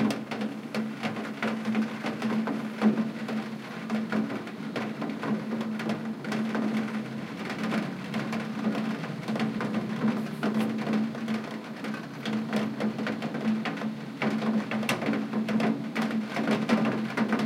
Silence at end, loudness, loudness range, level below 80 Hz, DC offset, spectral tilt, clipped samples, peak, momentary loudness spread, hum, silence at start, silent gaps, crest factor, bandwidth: 0 s; -30 LUFS; 3 LU; -72 dBFS; under 0.1%; -6 dB/octave; under 0.1%; -10 dBFS; 7 LU; none; 0 s; none; 20 dB; 15 kHz